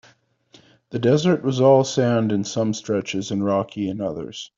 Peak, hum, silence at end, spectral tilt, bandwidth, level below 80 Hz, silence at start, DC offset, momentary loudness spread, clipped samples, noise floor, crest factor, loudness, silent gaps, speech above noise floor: -4 dBFS; none; 0.1 s; -6 dB/octave; 7.8 kHz; -62 dBFS; 0.9 s; under 0.1%; 11 LU; under 0.1%; -57 dBFS; 18 dB; -21 LUFS; none; 36 dB